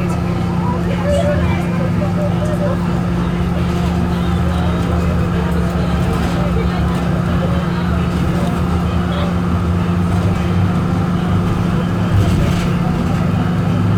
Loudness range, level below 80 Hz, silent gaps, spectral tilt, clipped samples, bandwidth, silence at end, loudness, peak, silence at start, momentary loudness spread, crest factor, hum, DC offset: 1 LU; -24 dBFS; none; -7.5 dB/octave; under 0.1%; 14 kHz; 0 s; -17 LUFS; -4 dBFS; 0 s; 2 LU; 12 dB; none; under 0.1%